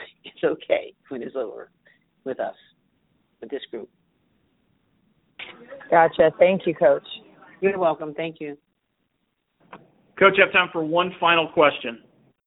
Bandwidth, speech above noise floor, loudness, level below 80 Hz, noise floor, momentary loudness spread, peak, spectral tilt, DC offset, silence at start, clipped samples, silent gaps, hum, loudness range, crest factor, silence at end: 4.1 kHz; 53 dB; -21 LUFS; -66 dBFS; -74 dBFS; 22 LU; -2 dBFS; -9.5 dB/octave; under 0.1%; 0 s; under 0.1%; none; none; 16 LU; 22 dB; 0.5 s